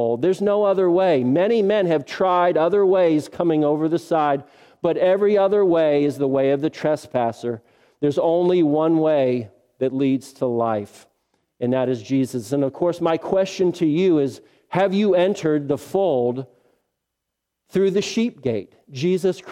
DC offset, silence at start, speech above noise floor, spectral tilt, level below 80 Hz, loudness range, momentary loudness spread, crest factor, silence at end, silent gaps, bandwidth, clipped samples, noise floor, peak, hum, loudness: under 0.1%; 0 s; 61 dB; -7 dB/octave; -64 dBFS; 5 LU; 9 LU; 16 dB; 0 s; none; 13.5 kHz; under 0.1%; -81 dBFS; -4 dBFS; none; -20 LUFS